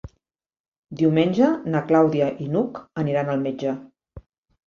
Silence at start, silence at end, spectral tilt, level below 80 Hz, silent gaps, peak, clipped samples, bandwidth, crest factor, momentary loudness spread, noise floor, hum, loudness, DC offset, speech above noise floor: 0.05 s; 0.45 s; -8.5 dB/octave; -56 dBFS; 0.60-0.72 s, 0.78-0.83 s; -6 dBFS; under 0.1%; 7 kHz; 18 dB; 10 LU; -80 dBFS; none; -22 LUFS; under 0.1%; 59 dB